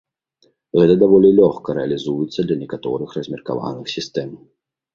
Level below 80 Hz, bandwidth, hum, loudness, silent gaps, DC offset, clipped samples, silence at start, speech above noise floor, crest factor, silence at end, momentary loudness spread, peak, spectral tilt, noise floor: -54 dBFS; 7.4 kHz; none; -18 LUFS; none; under 0.1%; under 0.1%; 0.75 s; 44 dB; 18 dB; 0.6 s; 15 LU; 0 dBFS; -7.5 dB/octave; -62 dBFS